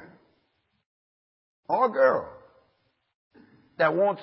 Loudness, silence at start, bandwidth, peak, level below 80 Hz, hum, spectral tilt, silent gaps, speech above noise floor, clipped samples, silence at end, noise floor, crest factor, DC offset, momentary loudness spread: -24 LUFS; 1.7 s; 5.8 kHz; -8 dBFS; -72 dBFS; none; -9.5 dB/octave; 3.15-3.31 s; 50 dB; under 0.1%; 0 s; -73 dBFS; 20 dB; under 0.1%; 9 LU